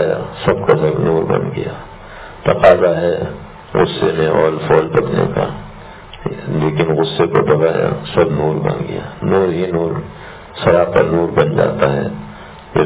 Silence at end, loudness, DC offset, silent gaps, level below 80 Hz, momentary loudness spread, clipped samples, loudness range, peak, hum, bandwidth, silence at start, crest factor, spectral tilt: 0 s; -15 LUFS; under 0.1%; none; -38 dBFS; 19 LU; 0.1%; 2 LU; 0 dBFS; none; 4 kHz; 0 s; 16 dB; -11 dB/octave